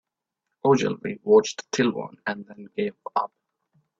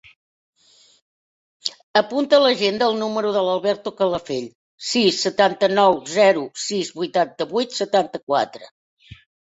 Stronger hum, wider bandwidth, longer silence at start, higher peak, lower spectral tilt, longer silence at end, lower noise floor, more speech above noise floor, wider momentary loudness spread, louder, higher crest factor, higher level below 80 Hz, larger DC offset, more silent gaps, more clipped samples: neither; about the same, 8 kHz vs 8 kHz; second, 0.65 s vs 1.65 s; second, -6 dBFS vs -2 dBFS; first, -5 dB/octave vs -3.5 dB/octave; first, 0.75 s vs 0.4 s; second, -83 dBFS vs under -90 dBFS; second, 59 dB vs over 71 dB; about the same, 13 LU vs 12 LU; second, -24 LUFS vs -20 LUFS; about the same, 20 dB vs 20 dB; about the same, -68 dBFS vs -64 dBFS; neither; second, none vs 1.83-1.94 s, 4.55-4.78 s, 8.23-8.27 s, 8.71-8.97 s; neither